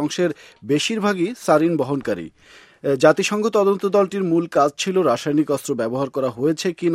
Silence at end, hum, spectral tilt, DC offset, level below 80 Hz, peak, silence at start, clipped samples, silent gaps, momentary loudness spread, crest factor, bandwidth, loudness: 0 s; none; -5 dB/octave; under 0.1%; -64 dBFS; 0 dBFS; 0 s; under 0.1%; none; 7 LU; 20 dB; 15.5 kHz; -20 LUFS